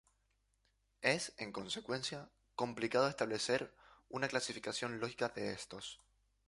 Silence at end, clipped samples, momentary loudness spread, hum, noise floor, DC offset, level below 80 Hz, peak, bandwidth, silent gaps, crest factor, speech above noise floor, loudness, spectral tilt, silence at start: 0.5 s; under 0.1%; 14 LU; none; -79 dBFS; under 0.1%; -74 dBFS; -16 dBFS; 11.5 kHz; none; 24 dB; 40 dB; -39 LUFS; -3.5 dB/octave; 1 s